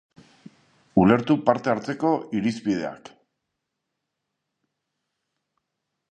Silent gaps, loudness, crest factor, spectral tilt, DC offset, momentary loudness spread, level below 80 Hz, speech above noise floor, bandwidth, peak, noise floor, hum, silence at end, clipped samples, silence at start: none; -23 LUFS; 24 dB; -7.5 dB/octave; under 0.1%; 8 LU; -58 dBFS; 59 dB; 9 kHz; -2 dBFS; -81 dBFS; none; 3.15 s; under 0.1%; 0.95 s